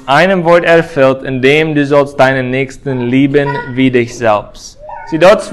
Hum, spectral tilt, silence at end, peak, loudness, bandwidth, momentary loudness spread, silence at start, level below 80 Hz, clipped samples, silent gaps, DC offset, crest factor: none; -6 dB/octave; 0 s; 0 dBFS; -10 LUFS; 12.5 kHz; 10 LU; 0.05 s; -42 dBFS; 0.7%; none; under 0.1%; 10 dB